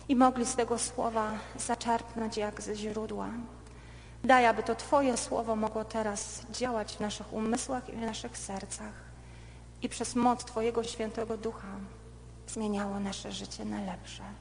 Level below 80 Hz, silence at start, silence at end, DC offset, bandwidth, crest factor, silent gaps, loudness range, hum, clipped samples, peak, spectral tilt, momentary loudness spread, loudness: -52 dBFS; 0 s; 0 s; under 0.1%; 10 kHz; 24 dB; none; 7 LU; none; under 0.1%; -8 dBFS; -4 dB/octave; 20 LU; -32 LUFS